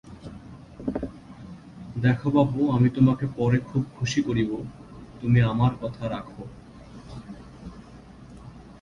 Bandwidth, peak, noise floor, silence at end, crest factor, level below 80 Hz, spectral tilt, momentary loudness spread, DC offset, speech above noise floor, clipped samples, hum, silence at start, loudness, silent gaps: 7.6 kHz; -8 dBFS; -46 dBFS; 0.1 s; 18 dB; -48 dBFS; -7.5 dB/octave; 24 LU; under 0.1%; 23 dB; under 0.1%; none; 0.05 s; -24 LUFS; none